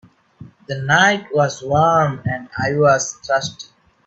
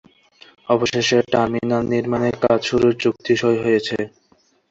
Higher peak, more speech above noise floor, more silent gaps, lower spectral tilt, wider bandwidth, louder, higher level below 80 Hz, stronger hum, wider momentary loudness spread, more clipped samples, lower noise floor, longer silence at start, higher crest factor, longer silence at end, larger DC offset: about the same, 0 dBFS vs -2 dBFS; second, 25 dB vs 41 dB; neither; about the same, -4.5 dB/octave vs -5 dB/octave; about the same, 8.2 kHz vs 7.8 kHz; about the same, -17 LUFS vs -19 LUFS; about the same, -52 dBFS vs -52 dBFS; neither; first, 13 LU vs 6 LU; neither; second, -43 dBFS vs -59 dBFS; second, 0.4 s vs 0.7 s; about the same, 18 dB vs 16 dB; second, 0.45 s vs 0.65 s; neither